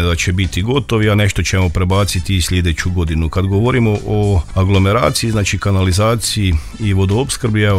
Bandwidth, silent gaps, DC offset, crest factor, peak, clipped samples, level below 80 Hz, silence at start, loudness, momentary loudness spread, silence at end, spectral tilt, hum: 15 kHz; none; under 0.1%; 14 dB; 0 dBFS; under 0.1%; -26 dBFS; 0 s; -15 LUFS; 4 LU; 0 s; -5.5 dB/octave; none